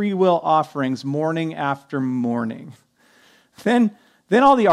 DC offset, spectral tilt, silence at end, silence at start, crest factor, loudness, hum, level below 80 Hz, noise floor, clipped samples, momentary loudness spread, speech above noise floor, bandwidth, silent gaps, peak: under 0.1%; -7 dB/octave; 0 s; 0 s; 16 dB; -20 LUFS; none; -64 dBFS; -55 dBFS; under 0.1%; 10 LU; 36 dB; 12 kHz; none; -4 dBFS